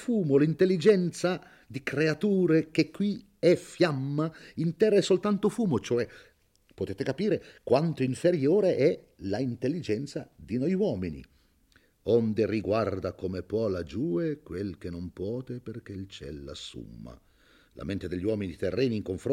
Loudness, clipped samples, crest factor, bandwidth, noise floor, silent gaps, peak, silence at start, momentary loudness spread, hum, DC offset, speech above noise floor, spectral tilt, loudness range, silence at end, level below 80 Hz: -28 LUFS; under 0.1%; 18 dB; 13 kHz; -64 dBFS; none; -10 dBFS; 0 s; 16 LU; none; under 0.1%; 36 dB; -7 dB/octave; 10 LU; 0 s; -60 dBFS